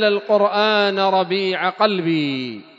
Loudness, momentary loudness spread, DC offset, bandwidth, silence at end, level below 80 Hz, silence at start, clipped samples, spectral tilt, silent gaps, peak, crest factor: -18 LUFS; 5 LU; under 0.1%; 7.8 kHz; 0.15 s; -76 dBFS; 0 s; under 0.1%; -6.5 dB/octave; none; -2 dBFS; 18 dB